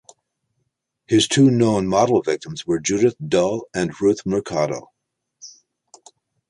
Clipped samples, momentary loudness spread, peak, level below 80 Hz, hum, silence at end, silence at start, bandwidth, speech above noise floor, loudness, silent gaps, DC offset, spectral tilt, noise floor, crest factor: under 0.1%; 10 LU; -2 dBFS; -54 dBFS; none; 1 s; 1.1 s; 11.5 kHz; 55 dB; -19 LUFS; none; under 0.1%; -5 dB/octave; -74 dBFS; 18 dB